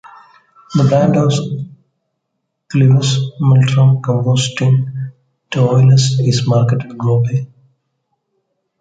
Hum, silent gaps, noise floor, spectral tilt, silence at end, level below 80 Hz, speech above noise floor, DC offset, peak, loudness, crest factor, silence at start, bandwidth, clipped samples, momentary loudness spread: none; none; -73 dBFS; -6.5 dB/octave; 1.35 s; -50 dBFS; 61 dB; under 0.1%; -2 dBFS; -14 LUFS; 12 dB; 0.7 s; 9.2 kHz; under 0.1%; 13 LU